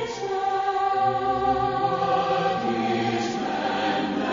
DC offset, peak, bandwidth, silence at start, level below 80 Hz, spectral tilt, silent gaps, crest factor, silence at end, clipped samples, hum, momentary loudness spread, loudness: under 0.1%; -10 dBFS; 7.4 kHz; 0 s; -54 dBFS; -3.5 dB/octave; none; 14 dB; 0 s; under 0.1%; none; 4 LU; -24 LUFS